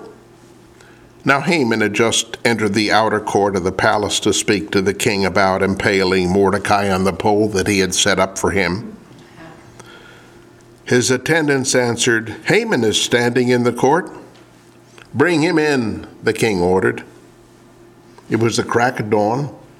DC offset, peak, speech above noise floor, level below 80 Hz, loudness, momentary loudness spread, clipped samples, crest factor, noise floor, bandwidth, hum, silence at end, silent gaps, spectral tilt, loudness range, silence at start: under 0.1%; 0 dBFS; 30 dB; -50 dBFS; -16 LUFS; 5 LU; under 0.1%; 18 dB; -46 dBFS; 16 kHz; none; 0.2 s; none; -4 dB/octave; 4 LU; 0 s